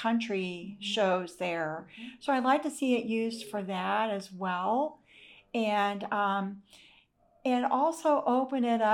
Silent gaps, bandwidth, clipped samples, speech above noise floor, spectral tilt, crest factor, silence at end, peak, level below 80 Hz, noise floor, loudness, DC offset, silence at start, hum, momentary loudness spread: none; 14.5 kHz; under 0.1%; 35 dB; -5 dB/octave; 16 dB; 0 s; -14 dBFS; -76 dBFS; -65 dBFS; -30 LUFS; under 0.1%; 0 s; none; 10 LU